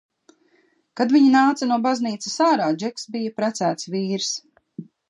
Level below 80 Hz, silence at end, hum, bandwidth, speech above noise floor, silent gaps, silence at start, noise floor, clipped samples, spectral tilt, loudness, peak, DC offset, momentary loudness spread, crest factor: -76 dBFS; 0.25 s; none; 11 kHz; 42 dB; none; 0.95 s; -62 dBFS; under 0.1%; -4.5 dB/octave; -21 LUFS; -4 dBFS; under 0.1%; 15 LU; 16 dB